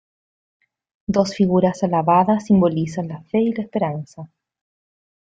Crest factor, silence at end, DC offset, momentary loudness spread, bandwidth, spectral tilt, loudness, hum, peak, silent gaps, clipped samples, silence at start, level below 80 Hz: 18 dB; 1.05 s; under 0.1%; 14 LU; 7.8 kHz; -7.5 dB/octave; -19 LUFS; none; -2 dBFS; none; under 0.1%; 1.1 s; -56 dBFS